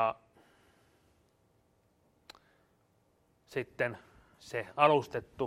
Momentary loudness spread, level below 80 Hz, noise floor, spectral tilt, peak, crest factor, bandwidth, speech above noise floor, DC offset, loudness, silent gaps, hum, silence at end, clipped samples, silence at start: 16 LU; -70 dBFS; -71 dBFS; -5.5 dB/octave; -10 dBFS; 26 dB; 14.5 kHz; 40 dB; under 0.1%; -32 LUFS; none; none; 0 s; under 0.1%; 0 s